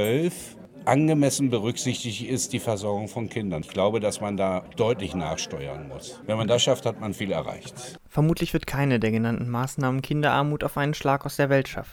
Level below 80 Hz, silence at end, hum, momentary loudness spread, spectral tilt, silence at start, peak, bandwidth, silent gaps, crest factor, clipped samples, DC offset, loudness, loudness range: -50 dBFS; 0 s; none; 10 LU; -5 dB/octave; 0 s; -4 dBFS; 19.5 kHz; none; 20 dB; under 0.1%; under 0.1%; -25 LUFS; 3 LU